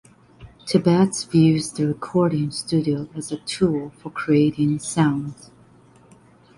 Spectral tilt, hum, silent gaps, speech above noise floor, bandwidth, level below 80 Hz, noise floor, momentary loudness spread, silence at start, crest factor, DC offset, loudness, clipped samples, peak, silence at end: -6 dB/octave; none; none; 31 dB; 11.5 kHz; -54 dBFS; -51 dBFS; 12 LU; 0.4 s; 18 dB; under 0.1%; -21 LUFS; under 0.1%; -4 dBFS; 1.25 s